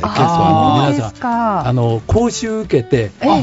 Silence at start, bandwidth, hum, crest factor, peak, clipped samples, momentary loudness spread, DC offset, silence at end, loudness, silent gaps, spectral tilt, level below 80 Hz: 0 s; 8 kHz; none; 12 dB; -2 dBFS; under 0.1%; 6 LU; under 0.1%; 0 s; -15 LUFS; none; -6.5 dB/octave; -36 dBFS